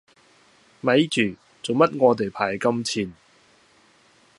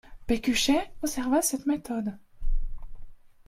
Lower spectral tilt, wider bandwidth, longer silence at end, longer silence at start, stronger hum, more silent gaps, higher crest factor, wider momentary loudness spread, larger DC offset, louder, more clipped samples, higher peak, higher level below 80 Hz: first, -5 dB/octave vs -3 dB/octave; second, 11.5 kHz vs 16 kHz; first, 1.25 s vs 0.2 s; first, 0.85 s vs 0.1 s; neither; neither; first, 22 dB vs 16 dB; second, 10 LU vs 14 LU; neither; first, -22 LUFS vs -28 LUFS; neither; first, -4 dBFS vs -12 dBFS; second, -62 dBFS vs -34 dBFS